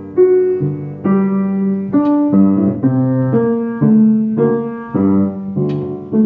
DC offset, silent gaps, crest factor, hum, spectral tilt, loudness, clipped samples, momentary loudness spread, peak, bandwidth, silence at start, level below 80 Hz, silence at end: under 0.1%; none; 12 dB; none; -11 dB/octave; -14 LUFS; under 0.1%; 8 LU; -2 dBFS; 3.4 kHz; 0 s; -56 dBFS; 0 s